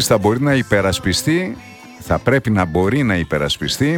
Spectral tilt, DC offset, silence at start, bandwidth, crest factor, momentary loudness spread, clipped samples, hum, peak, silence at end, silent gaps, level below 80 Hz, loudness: -5 dB/octave; under 0.1%; 0 s; 18.5 kHz; 16 dB; 6 LU; under 0.1%; none; 0 dBFS; 0 s; none; -38 dBFS; -17 LUFS